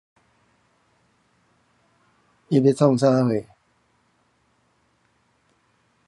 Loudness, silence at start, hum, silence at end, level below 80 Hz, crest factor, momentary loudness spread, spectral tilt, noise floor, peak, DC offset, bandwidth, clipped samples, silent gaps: -20 LUFS; 2.5 s; none; 2.65 s; -68 dBFS; 22 dB; 7 LU; -8 dB/octave; -66 dBFS; -4 dBFS; under 0.1%; 11.5 kHz; under 0.1%; none